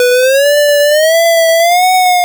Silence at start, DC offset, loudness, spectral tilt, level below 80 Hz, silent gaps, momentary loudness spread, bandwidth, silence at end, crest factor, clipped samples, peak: 0 s; under 0.1%; -8 LUFS; 3.5 dB/octave; -66 dBFS; none; 0 LU; over 20 kHz; 0 s; 2 dB; under 0.1%; -6 dBFS